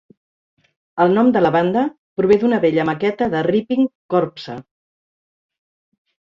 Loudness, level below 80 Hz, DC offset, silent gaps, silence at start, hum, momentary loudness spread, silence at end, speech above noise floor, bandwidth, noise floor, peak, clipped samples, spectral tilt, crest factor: -17 LUFS; -58 dBFS; under 0.1%; 1.98-2.16 s, 3.95-4.09 s; 0.95 s; none; 12 LU; 1.65 s; over 73 dB; 7.2 kHz; under -90 dBFS; -2 dBFS; under 0.1%; -8 dB/octave; 16 dB